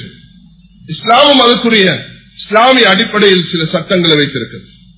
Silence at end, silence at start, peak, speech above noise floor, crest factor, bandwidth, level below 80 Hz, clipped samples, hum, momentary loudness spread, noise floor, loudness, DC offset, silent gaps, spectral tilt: 0.35 s; 0 s; 0 dBFS; 32 dB; 10 dB; 4 kHz; -48 dBFS; 1%; none; 15 LU; -41 dBFS; -8 LUFS; under 0.1%; none; -8.5 dB/octave